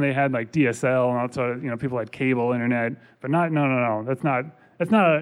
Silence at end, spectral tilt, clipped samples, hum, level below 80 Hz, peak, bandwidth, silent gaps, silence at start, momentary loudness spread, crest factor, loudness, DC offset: 0 s; -7.5 dB/octave; under 0.1%; none; -64 dBFS; -8 dBFS; 11.5 kHz; none; 0 s; 7 LU; 16 dB; -23 LUFS; under 0.1%